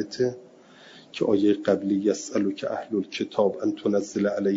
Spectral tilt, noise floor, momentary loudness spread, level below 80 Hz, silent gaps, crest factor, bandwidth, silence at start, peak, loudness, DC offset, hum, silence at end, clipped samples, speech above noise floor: -5.5 dB/octave; -50 dBFS; 7 LU; -70 dBFS; none; 18 dB; 7.8 kHz; 0 s; -8 dBFS; -25 LUFS; under 0.1%; none; 0 s; under 0.1%; 26 dB